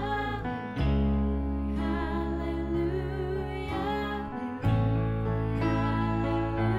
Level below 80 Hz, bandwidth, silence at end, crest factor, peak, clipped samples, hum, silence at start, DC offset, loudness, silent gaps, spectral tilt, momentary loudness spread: -36 dBFS; 7.4 kHz; 0 s; 14 dB; -14 dBFS; under 0.1%; none; 0 s; under 0.1%; -30 LUFS; none; -9 dB/octave; 6 LU